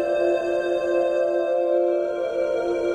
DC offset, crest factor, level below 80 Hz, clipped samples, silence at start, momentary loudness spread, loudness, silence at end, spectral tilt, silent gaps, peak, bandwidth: under 0.1%; 12 dB; -58 dBFS; under 0.1%; 0 s; 3 LU; -23 LUFS; 0 s; -5.5 dB/octave; none; -10 dBFS; 9.4 kHz